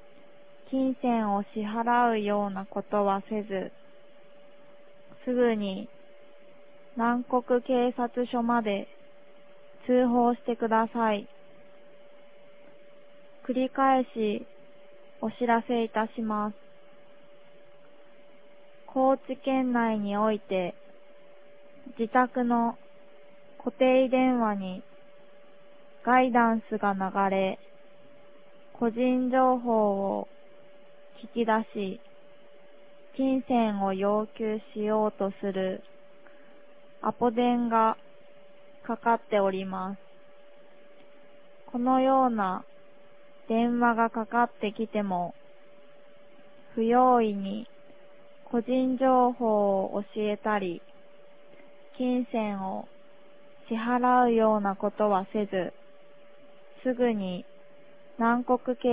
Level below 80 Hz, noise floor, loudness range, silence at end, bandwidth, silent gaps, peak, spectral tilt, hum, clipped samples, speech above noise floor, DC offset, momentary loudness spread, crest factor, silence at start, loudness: -68 dBFS; -56 dBFS; 5 LU; 0 s; 4 kHz; none; -8 dBFS; -10 dB/octave; none; under 0.1%; 30 dB; 0.4%; 13 LU; 20 dB; 0.7 s; -27 LUFS